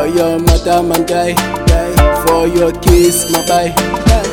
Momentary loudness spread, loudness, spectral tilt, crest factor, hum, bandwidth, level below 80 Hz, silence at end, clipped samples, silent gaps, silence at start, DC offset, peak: 4 LU; -12 LUFS; -5 dB/octave; 10 dB; none; 18 kHz; -18 dBFS; 0 s; under 0.1%; none; 0 s; under 0.1%; 0 dBFS